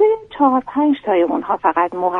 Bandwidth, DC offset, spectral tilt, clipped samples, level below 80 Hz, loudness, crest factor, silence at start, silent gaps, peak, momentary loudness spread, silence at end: 3.9 kHz; under 0.1%; -7.5 dB/octave; under 0.1%; -56 dBFS; -17 LUFS; 14 dB; 0 s; none; -2 dBFS; 2 LU; 0 s